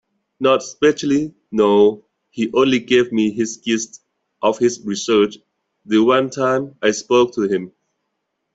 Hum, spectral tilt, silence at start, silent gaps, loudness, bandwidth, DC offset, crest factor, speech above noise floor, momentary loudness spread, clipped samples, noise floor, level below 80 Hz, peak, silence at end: none; -4.5 dB/octave; 0.4 s; none; -18 LUFS; 8 kHz; under 0.1%; 16 dB; 58 dB; 9 LU; under 0.1%; -74 dBFS; -60 dBFS; -2 dBFS; 0.85 s